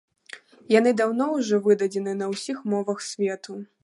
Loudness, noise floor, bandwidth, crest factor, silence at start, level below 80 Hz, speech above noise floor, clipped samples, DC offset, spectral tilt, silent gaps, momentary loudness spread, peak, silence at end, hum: -24 LUFS; -47 dBFS; 11.5 kHz; 20 dB; 0.35 s; -78 dBFS; 23 dB; under 0.1%; under 0.1%; -5 dB/octave; none; 21 LU; -4 dBFS; 0.2 s; none